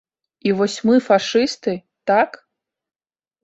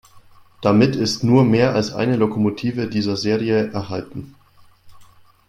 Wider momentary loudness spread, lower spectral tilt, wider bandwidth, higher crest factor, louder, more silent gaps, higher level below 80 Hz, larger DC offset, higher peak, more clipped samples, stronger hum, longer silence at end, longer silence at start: about the same, 10 LU vs 12 LU; second, -5 dB/octave vs -6.5 dB/octave; second, 8.2 kHz vs 13 kHz; about the same, 18 dB vs 18 dB; about the same, -19 LUFS vs -19 LUFS; neither; second, -64 dBFS vs -52 dBFS; neither; about the same, -2 dBFS vs -2 dBFS; neither; neither; first, 1.15 s vs 0.45 s; first, 0.45 s vs 0.15 s